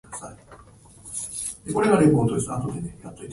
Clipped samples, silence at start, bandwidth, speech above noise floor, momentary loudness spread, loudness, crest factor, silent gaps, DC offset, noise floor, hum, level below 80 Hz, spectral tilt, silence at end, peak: under 0.1%; 0.1 s; 11.5 kHz; 27 dB; 21 LU; -23 LUFS; 20 dB; none; under 0.1%; -49 dBFS; none; -50 dBFS; -6 dB/octave; 0 s; -4 dBFS